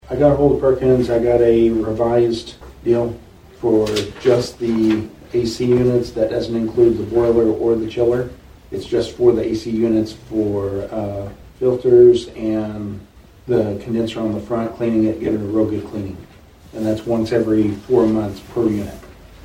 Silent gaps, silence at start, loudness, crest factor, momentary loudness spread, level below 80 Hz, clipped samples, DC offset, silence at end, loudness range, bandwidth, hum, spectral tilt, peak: none; 0.05 s; -18 LUFS; 16 dB; 12 LU; -42 dBFS; under 0.1%; under 0.1%; 0.1 s; 4 LU; 11 kHz; none; -7.5 dB/octave; -2 dBFS